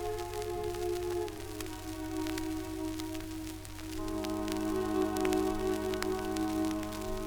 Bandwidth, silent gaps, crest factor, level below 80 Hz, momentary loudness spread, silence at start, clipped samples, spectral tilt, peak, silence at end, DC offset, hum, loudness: over 20 kHz; none; 24 dB; -48 dBFS; 9 LU; 0 s; under 0.1%; -5 dB/octave; -10 dBFS; 0 s; under 0.1%; none; -35 LUFS